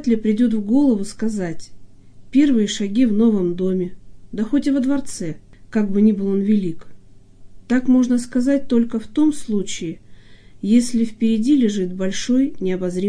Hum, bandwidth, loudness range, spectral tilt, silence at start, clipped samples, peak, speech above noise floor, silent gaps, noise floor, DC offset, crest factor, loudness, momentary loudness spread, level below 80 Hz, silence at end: none; 10.5 kHz; 2 LU; -6 dB/octave; 0 s; under 0.1%; -4 dBFS; 24 dB; none; -41 dBFS; under 0.1%; 14 dB; -19 LUFS; 13 LU; -46 dBFS; 0 s